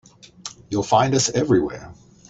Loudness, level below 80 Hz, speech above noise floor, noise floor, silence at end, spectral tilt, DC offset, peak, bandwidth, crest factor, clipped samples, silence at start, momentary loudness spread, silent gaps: -20 LUFS; -52 dBFS; 21 dB; -40 dBFS; 0.35 s; -4.5 dB/octave; under 0.1%; -2 dBFS; 8.4 kHz; 20 dB; under 0.1%; 0.45 s; 19 LU; none